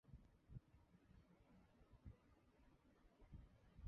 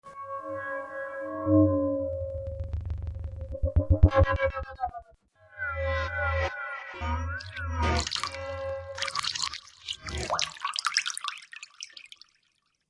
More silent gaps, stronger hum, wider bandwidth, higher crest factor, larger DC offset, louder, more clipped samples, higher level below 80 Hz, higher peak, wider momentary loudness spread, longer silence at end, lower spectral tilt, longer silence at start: neither; neither; second, 5.6 kHz vs 11.5 kHz; about the same, 22 dB vs 26 dB; neither; second, -66 LUFS vs -30 LUFS; neither; second, -70 dBFS vs -38 dBFS; second, -44 dBFS vs -4 dBFS; second, 4 LU vs 15 LU; second, 0 s vs 0.85 s; first, -8 dB/octave vs -5 dB/octave; about the same, 0.05 s vs 0.05 s